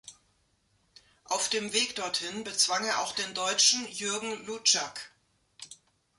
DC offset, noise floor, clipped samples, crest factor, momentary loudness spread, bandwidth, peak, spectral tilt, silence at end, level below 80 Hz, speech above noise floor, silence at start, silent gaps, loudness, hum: under 0.1%; -71 dBFS; under 0.1%; 22 dB; 23 LU; 12 kHz; -10 dBFS; 0 dB/octave; 0.45 s; -74 dBFS; 41 dB; 0.05 s; none; -27 LUFS; none